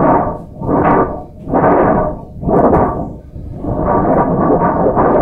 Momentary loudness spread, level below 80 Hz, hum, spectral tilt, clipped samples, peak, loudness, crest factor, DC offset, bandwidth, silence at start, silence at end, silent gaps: 13 LU; -28 dBFS; none; -11.5 dB/octave; under 0.1%; 0 dBFS; -13 LUFS; 12 dB; under 0.1%; 3.5 kHz; 0 s; 0 s; none